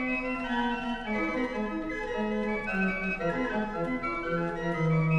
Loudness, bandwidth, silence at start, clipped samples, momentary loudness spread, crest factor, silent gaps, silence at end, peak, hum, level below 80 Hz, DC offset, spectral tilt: -30 LUFS; 8.6 kHz; 0 s; under 0.1%; 3 LU; 14 dB; none; 0 s; -16 dBFS; none; -46 dBFS; under 0.1%; -7.5 dB/octave